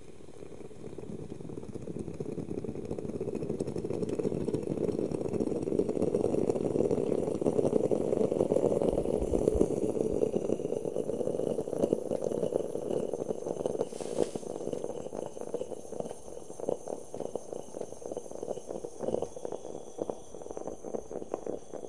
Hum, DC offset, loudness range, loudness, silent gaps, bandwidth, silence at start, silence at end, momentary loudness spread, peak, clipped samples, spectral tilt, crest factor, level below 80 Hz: none; 0.5%; 10 LU; -33 LUFS; none; 11.5 kHz; 0 s; 0 s; 13 LU; -10 dBFS; under 0.1%; -7.5 dB/octave; 24 dB; -52 dBFS